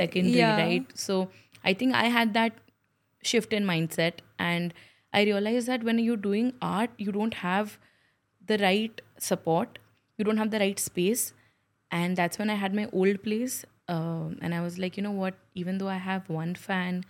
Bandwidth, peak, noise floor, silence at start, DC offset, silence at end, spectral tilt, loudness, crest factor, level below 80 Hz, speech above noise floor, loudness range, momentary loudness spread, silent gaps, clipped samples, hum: 16.5 kHz; -6 dBFS; -73 dBFS; 0 s; under 0.1%; 0.05 s; -4.5 dB/octave; -28 LUFS; 24 dB; -72 dBFS; 45 dB; 3 LU; 9 LU; none; under 0.1%; none